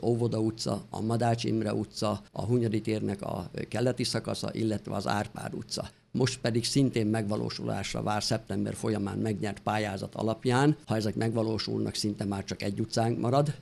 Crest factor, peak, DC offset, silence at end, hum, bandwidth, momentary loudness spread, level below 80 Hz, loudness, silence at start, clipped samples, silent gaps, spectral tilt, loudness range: 18 dB; -12 dBFS; under 0.1%; 0 s; none; 13 kHz; 7 LU; -58 dBFS; -30 LUFS; 0 s; under 0.1%; none; -5.5 dB/octave; 2 LU